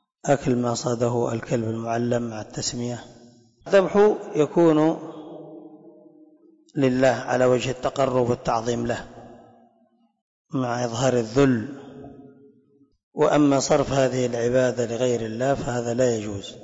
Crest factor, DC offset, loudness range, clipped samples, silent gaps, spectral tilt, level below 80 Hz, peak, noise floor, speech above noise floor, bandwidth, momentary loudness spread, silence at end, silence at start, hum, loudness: 14 dB; under 0.1%; 4 LU; under 0.1%; 10.21-10.45 s, 13.03-13.12 s; -5.5 dB/octave; -52 dBFS; -8 dBFS; -63 dBFS; 41 dB; 8 kHz; 15 LU; 0 s; 0.25 s; none; -23 LUFS